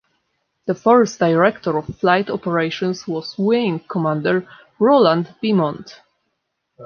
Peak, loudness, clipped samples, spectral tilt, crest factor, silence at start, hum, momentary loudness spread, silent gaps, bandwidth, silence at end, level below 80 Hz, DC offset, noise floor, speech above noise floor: -2 dBFS; -18 LUFS; under 0.1%; -6.5 dB/octave; 16 dB; 0.65 s; none; 10 LU; none; 7 kHz; 0 s; -58 dBFS; under 0.1%; -74 dBFS; 56 dB